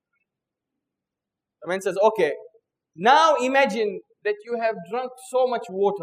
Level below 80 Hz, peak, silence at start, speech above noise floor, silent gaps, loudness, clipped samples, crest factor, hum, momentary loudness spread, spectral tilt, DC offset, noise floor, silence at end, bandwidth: -84 dBFS; -4 dBFS; 1.6 s; 65 dB; none; -22 LUFS; under 0.1%; 20 dB; none; 13 LU; -4 dB/octave; under 0.1%; -87 dBFS; 0 s; 15.5 kHz